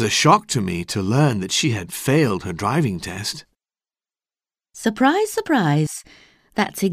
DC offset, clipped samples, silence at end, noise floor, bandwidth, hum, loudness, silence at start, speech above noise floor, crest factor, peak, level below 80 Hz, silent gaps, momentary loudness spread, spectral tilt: under 0.1%; under 0.1%; 0 s; under -90 dBFS; 16 kHz; none; -20 LUFS; 0 s; over 70 dB; 18 dB; -2 dBFS; -54 dBFS; none; 10 LU; -4.5 dB/octave